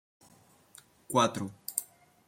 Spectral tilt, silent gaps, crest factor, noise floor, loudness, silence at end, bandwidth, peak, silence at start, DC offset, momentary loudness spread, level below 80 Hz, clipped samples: -3.5 dB/octave; none; 26 dB; -62 dBFS; -31 LUFS; 0.45 s; 16.5 kHz; -8 dBFS; 1.1 s; under 0.1%; 11 LU; -74 dBFS; under 0.1%